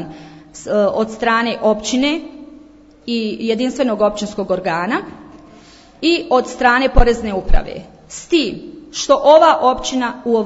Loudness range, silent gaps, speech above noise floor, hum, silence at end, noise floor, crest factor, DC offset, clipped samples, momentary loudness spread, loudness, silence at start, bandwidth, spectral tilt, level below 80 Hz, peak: 5 LU; none; 28 dB; none; 0 s; -43 dBFS; 16 dB; under 0.1%; under 0.1%; 20 LU; -16 LUFS; 0 s; 8 kHz; -4.5 dB/octave; -26 dBFS; 0 dBFS